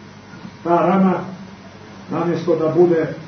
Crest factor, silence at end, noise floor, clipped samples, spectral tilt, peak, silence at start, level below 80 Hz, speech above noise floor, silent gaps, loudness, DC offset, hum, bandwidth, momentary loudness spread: 16 dB; 0 s; -38 dBFS; under 0.1%; -8.5 dB/octave; -4 dBFS; 0 s; -58 dBFS; 22 dB; none; -18 LUFS; under 0.1%; none; 6.4 kHz; 23 LU